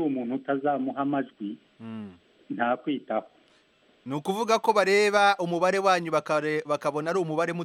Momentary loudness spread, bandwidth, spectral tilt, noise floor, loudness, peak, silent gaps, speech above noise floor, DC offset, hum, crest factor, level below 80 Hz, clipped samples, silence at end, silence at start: 18 LU; 15 kHz; -5 dB/octave; -62 dBFS; -26 LUFS; -8 dBFS; none; 36 dB; under 0.1%; none; 18 dB; -78 dBFS; under 0.1%; 0 s; 0 s